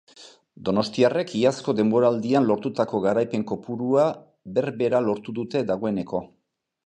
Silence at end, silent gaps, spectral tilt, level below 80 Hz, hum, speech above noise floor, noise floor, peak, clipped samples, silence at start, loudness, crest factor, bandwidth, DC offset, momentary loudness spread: 0.6 s; none; -6.5 dB/octave; -62 dBFS; none; 27 dB; -50 dBFS; -6 dBFS; under 0.1%; 0.2 s; -24 LUFS; 18 dB; 9.8 kHz; under 0.1%; 8 LU